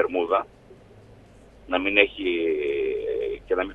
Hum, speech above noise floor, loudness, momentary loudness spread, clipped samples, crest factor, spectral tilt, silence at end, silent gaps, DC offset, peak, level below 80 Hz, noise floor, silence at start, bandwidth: none; 26 dB; -24 LUFS; 9 LU; under 0.1%; 24 dB; -6 dB/octave; 0 s; none; under 0.1%; 0 dBFS; -52 dBFS; -50 dBFS; 0 s; 4.7 kHz